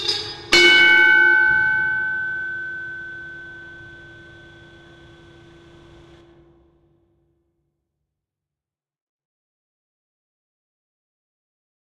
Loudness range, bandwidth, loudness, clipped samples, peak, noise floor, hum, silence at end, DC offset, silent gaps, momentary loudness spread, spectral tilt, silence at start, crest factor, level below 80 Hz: 25 LU; 13.5 kHz; -14 LUFS; under 0.1%; -2 dBFS; under -90 dBFS; none; 7.95 s; under 0.1%; none; 25 LU; -1.5 dB/octave; 0 s; 20 dB; -56 dBFS